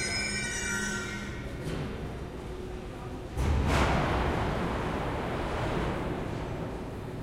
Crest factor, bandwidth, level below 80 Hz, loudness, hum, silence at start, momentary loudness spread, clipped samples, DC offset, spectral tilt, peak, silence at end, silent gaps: 16 dB; 15.5 kHz; -38 dBFS; -32 LUFS; none; 0 s; 12 LU; under 0.1%; under 0.1%; -4.5 dB/octave; -14 dBFS; 0 s; none